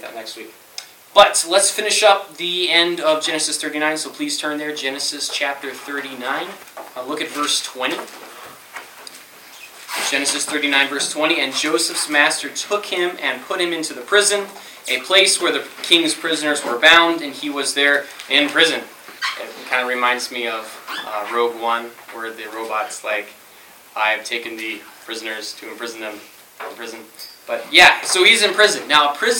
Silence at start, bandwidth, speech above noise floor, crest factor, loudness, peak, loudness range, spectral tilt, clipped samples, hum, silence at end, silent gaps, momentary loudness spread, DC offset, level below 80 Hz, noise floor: 0 s; 17.5 kHz; 26 dB; 20 dB; -17 LUFS; 0 dBFS; 10 LU; -0.5 dB/octave; under 0.1%; none; 0 s; none; 21 LU; under 0.1%; -64 dBFS; -45 dBFS